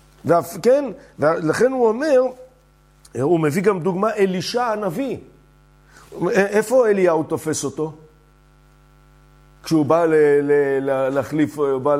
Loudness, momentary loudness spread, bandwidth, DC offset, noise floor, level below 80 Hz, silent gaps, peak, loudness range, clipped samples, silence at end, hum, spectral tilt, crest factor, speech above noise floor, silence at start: -19 LUFS; 10 LU; 16 kHz; under 0.1%; -53 dBFS; -56 dBFS; none; -2 dBFS; 2 LU; under 0.1%; 0 s; none; -6 dB/octave; 16 dB; 35 dB; 0.25 s